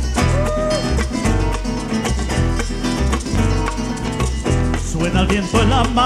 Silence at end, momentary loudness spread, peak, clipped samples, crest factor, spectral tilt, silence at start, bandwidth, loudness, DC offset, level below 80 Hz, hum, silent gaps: 0 s; 6 LU; -2 dBFS; under 0.1%; 14 dB; -5.5 dB/octave; 0 s; 13.5 kHz; -19 LUFS; under 0.1%; -22 dBFS; none; none